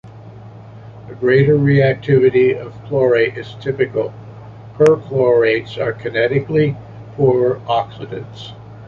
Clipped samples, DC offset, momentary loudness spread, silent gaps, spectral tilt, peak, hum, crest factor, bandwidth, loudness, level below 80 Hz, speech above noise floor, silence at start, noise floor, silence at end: under 0.1%; under 0.1%; 21 LU; none; -8 dB/octave; -2 dBFS; none; 14 dB; 7.2 kHz; -16 LUFS; -50 dBFS; 21 dB; 0.05 s; -36 dBFS; 0 s